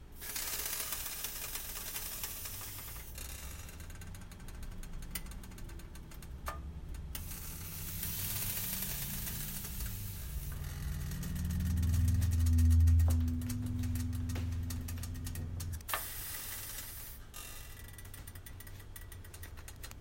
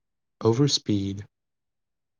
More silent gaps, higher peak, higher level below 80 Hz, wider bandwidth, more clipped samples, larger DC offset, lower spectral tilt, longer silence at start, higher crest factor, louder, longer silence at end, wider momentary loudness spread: neither; second, -20 dBFS vs -10 dBFS; first, -44 dBFS vs -70 dBFS; first, 16.5 kHz vs 10 kHz; neither; neither; about the same, -4.5 dB/octave vs -5.5 dB/octave; second, 0 s vs 0.4 s; about the same, 18 dB vs 18 dB; second, -37 LUFS vs -24 LUFS; second, 0 s vs 0.95 s; first, 17 LU vs 12 LU